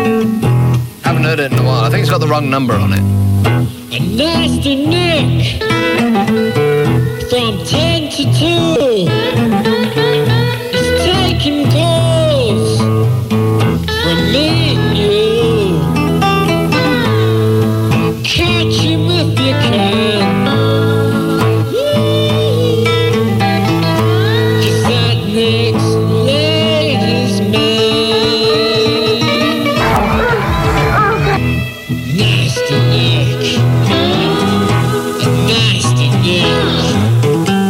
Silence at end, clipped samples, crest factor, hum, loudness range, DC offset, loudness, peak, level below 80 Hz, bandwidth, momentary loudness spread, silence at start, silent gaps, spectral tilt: 0 s; under 0.1%; 12 dB; none; 1 LU; 0.1%; -12 LUFS; 0 dBFS; -32 dBFS; 16 kHz; 3 LU; 0 s; none; -6 dB/octave